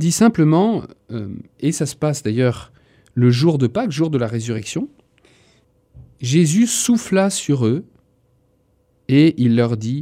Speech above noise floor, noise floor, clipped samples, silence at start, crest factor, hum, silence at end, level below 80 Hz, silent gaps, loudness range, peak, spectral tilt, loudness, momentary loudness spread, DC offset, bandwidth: 44 dB; -61 dBFS; under 0.1%; 0 s; 16 dB; none; 0 s; -56 dBFS; none; 2 LU; -2 dBFS; -6 dB/octave; -18 LUFS; 14 LU; under 0.1%; 16 kHz